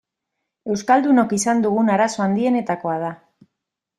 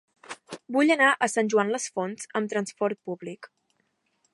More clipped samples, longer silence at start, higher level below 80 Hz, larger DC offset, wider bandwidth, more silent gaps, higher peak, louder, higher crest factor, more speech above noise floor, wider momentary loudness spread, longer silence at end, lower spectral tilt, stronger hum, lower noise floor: neither; first, 0.65 s vs 0.3 s; first, -64 dBFS vs -82 dBFS; neither; about the same, 12 kHz vs 11.5 kHz; neither; first, -2 dBFS vs -6 dBFS; first, -19 LUFS vs -25 LUFS; about the same, 18 dB vs 20 dB; first, 63 dB vs 48 dB; second, 10 LU vs 21 LU; about the same, 0.85 s vs 0.9 s; first, -5.5 dB/octave vs -3.5 dB/octave; neither; first, -82 dBFS vs -73 dBFS